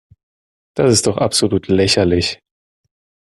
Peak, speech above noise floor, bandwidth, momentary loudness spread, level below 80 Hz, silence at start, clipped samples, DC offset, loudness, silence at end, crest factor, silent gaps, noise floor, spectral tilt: 0 dBFS; over 75 dB; 12.5 kHz; 9 LU; -48 dBFS; 0.75 s; under 0.1%; under 0.1%; -15 LUFS; 0.95 s; 16 dB; none; under -90 dBFS; -4 dB/octave